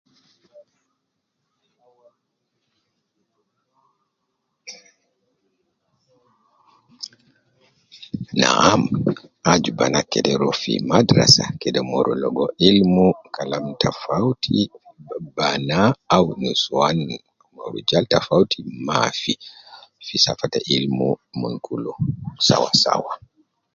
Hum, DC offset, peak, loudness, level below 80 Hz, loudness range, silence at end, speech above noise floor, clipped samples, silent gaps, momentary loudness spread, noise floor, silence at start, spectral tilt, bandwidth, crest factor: none; under 0.1%; 0 dBFS; -19 LUFS; -52 dBFS; 5 LU; 0.6 s; 57 dB; under 0.1%; none; 18 LU; -76 dBFS; 0.55 s; -4.5 dB/octave; 11.5 kHz; 22 dB